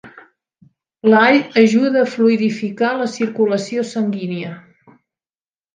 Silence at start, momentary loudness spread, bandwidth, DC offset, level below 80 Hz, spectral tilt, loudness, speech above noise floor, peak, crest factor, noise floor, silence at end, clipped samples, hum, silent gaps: 0.05 s; 10 LU; 9.2 kHz; under 0.1%; -68 dBFS; -6 dB/octave; -16 LUFS; over 74 dB; 0 dBFS; 18 dB; under -90 dBFS; 1.15 s; under 0.1%; none; none